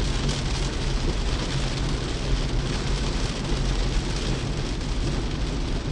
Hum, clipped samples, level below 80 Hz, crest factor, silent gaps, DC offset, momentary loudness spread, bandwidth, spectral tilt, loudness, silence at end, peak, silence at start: none; under 0.1%; -28 dBFS; 14 dB; none; under 0.1%; 2 LU; 11 kHz; -5 dB/octave; -27 LUFS; 0 s; -12 dBFS; 0 s